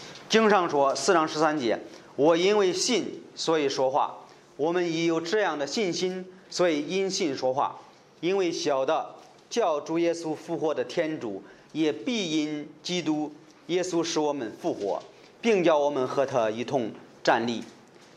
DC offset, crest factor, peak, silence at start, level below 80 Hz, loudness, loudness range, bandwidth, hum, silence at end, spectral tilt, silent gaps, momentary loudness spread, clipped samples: under 0.1%; 20 dB; -6 dBFS; 0 s; -78 dBFS; -26 LUFS; 5 LU; 12 kHz; none; 0.45 s; -4 dB/octave; none; 11 LU; under 0.1%